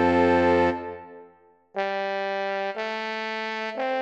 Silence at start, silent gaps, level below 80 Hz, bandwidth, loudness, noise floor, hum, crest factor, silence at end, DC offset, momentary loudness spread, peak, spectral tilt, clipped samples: 0 s; none; -48 dBFS; 8.4 kHz; -25 LUFS; -56 dBFS; none; 16 dB; 0 s; under 0.1%; 16 LU; -8 dBFS; -6 dB/octave; under 0.1%